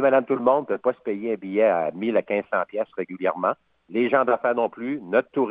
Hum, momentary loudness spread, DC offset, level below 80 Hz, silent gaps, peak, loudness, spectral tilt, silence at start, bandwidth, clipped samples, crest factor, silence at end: none; 9 LU; under 0.1%; -72 dBFS; none; -6 dBFS; -24 LUFS; -9.5 dB/octave; 0 s; 3.9 kHz; under 0.1%; 16 dB; 0 s